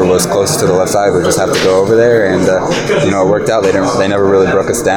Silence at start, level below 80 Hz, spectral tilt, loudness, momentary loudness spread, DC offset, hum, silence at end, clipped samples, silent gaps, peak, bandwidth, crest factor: 0 s; -40 dBFS; -4.5 dB/octave; -11 LUFS; 3 LU; under 0.1%; none; 0 s; under 0.1%; none; 0 dBFS; over 20 kHz; 10 dB